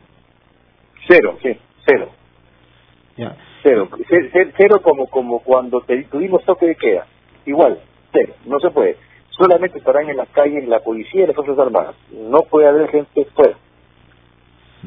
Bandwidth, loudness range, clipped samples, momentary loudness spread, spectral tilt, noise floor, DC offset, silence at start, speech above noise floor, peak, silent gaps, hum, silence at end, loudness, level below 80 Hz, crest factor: 5.4 kHz; 3 LU; under 0.1%; 12 LU; -9 dB/octave; -54 dBFS; under 0.1%; 1 s; 39 dB; 0 dBFS; none; none; 1.35 s; -15 LUFS; -56 dBFS; 16 dB